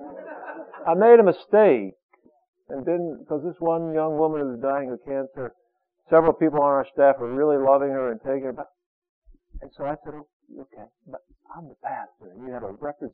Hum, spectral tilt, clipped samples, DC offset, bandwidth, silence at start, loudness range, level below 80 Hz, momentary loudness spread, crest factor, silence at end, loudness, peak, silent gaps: none; -7 dB/octave; under 0.1%; under 0.1%; 4.7 kHz; 0 s; 17 LU; -56 dBFS; 20 LU; 20 dB; 0.05 s; -22 LUFS; -4 dBFS; 2.03-2.09 s, 2.48-2.53 s, 8.86-9.02 s, 9.09-9.22 s, 10.33-10.40 s